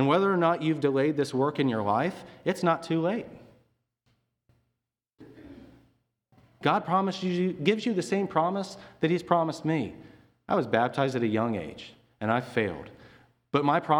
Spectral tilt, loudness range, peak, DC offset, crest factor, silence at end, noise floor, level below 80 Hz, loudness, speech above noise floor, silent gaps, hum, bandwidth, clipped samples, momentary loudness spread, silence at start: -6.5 dB/octave; 6 LU; -6 dBFS; under 0.1%; 22 dB; 0 s; -84 dBFS; -66 dBFS; -27 LUFS; 57 dB; none; none; 18 kHz; under 0.1%; 10 LU; 0 s